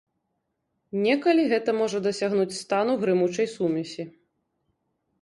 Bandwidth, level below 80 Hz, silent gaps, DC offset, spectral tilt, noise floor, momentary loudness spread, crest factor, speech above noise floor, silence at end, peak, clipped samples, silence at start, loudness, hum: 11.5 kHz; -72 dBFS; none; under 0.1%; -5.5 dB/octave; -78 dBFS; 11 LU; 16 dB; 54 dB; 1.1 s; -10 dBFS; under 0.1%; 0.95 s; -24 LUFS; none